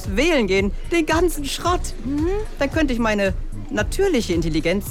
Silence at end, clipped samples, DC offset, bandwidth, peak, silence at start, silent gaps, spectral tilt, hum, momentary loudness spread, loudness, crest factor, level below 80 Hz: 0 s; under 0.1%; under 0.1%; 16.5 kHz; -6 dBFS; 0 s; none; -5 dB/octave; none; 6 LU; -21 LUFS; 14 dB; -28 dBFS